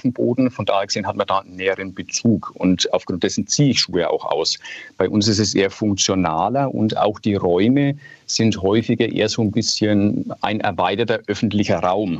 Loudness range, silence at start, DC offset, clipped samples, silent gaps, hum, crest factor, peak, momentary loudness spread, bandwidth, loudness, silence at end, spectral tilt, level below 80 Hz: 1 LU; 0.05 s; under 0.1%; under 0.1%; none; none; 16 dB; -2 dBFS; 6 LU; 8.2 kHz; -19 LUFS; 0 s; -4.5 dB/octave; -58 dBFS